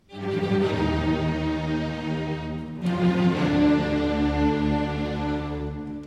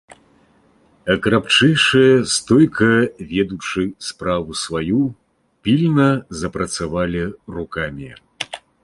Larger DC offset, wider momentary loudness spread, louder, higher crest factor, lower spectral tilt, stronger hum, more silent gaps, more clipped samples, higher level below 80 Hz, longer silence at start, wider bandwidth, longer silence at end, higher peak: neither; second, 9 LU vs 15 LU; second, -25 LUFS vs -17 LUFS; about the same, 14 dB vs 18 dB; first, -7.5 dB/octave vs -5 dB/octave; neither; neither; neither; first, -38 dBFS vs -44 dBFS; about the same, 0.1 s vs 0.1 s; second, 9.6 kHz vs 11.5 kHz; second, 0 s vs 0.25 s; second, -10 dBFS vs -2 dBFS